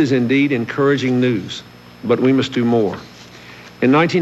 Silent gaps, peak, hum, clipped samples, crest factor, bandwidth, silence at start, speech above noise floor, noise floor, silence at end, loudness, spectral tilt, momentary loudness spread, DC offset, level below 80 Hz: none; -2 dBFS; 60 Hz at -40 dBFS; under 0.1%; 14 dB; 12 kHz; 0 s; 23 dB; -39 dBFS; 0 s; -16 LUFS; -6.5 dB/octave; 19 LU; under 0.1%; -56 dBFS